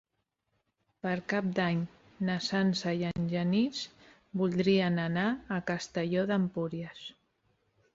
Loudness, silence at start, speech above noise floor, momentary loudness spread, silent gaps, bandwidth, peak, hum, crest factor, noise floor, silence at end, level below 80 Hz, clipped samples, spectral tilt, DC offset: -31 LUFS; 1.05 s; 51 dB; 12 LU; none; 7.8 kHz; -16 dBFS; none; 16 dB; -81 dBFS; 0.85 s; -66 dBFS; under 0.1%; -6 dB/octave; under 0.1%